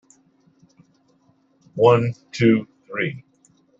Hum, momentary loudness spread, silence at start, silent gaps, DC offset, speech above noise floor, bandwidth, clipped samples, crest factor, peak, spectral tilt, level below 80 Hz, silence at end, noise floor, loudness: none; 17 LU; 1.75 s; none; under 0.1%; 42 dB; 7.8 kHz; under 0.1%; 22 dB; -2 dBFS; -7.5 dB/octave; -62 dBFS; 0.6 s; -61 dBFS; -20 LUFS